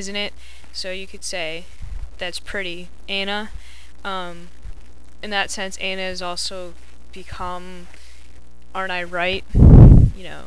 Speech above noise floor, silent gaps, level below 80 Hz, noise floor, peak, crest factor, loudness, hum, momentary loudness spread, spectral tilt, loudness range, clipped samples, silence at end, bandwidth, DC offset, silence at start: 17 dB; none; -22 dBFS; -41 dBFS; 0 dBFS; 18 dB; -19 LUFS; none; 25 LU; -6 dB/octave; 13 LU; 0.2%; 0.05 s; 11 kHz; 4%; 0 s